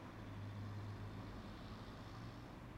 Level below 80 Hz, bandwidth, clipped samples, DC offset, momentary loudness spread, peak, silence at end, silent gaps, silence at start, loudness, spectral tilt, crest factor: -62 dBFS; 15.5 kHz; under 0.1%; under 0.1%; 4 LU; -40 dBFS; 0 s; none; 0 s; -52 LUFS; -7 dB/octave; 10 dB